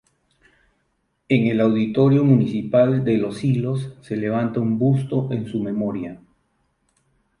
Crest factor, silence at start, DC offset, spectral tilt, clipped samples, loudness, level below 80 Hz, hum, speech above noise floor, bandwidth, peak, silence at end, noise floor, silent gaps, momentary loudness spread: 18 dB; 1.3 s; under 0.1%; -9 dB/octave; under 0.1%; -20 LUFS; -58 dBFS; none; 51 dB; 11 kHz; -4 dBFS; 1.25 s; -70 dBFS; none; 10 LU